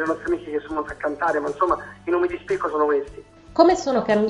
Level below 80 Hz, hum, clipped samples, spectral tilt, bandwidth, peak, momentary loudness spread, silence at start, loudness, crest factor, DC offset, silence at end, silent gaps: -50 dBFS; none; under 0.1%; -5.5 dB/octave; 10.5 kHz; -2 dBFS; 10 LU; 0 s; -22 LUFS; 20 dB; under 0.1%; 0 s; none